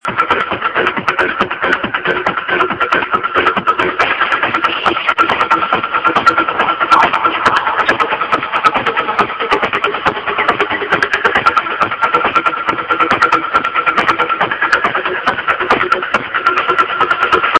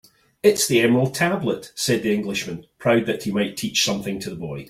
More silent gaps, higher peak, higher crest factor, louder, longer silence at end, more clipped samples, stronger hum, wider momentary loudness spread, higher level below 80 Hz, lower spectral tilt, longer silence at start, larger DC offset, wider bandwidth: neither; first, 0 dBFS vs -4 dBFS; about the same, 14 dB vs 18 dB; first, -13 LUFS vs -21 LUFS; about the same, 0 s vs 0.05 s; neither; neither; second, 4 LU vs 10 LU; first, -46 dBFS vs -58 dBFS; about the same, -4 dB/octave vs -4 dB/octave; second, 0.05 s vs 0.45 s; first, 0.1% vs under 0.1%; second, 10.5 kHz vs 16.5 kHz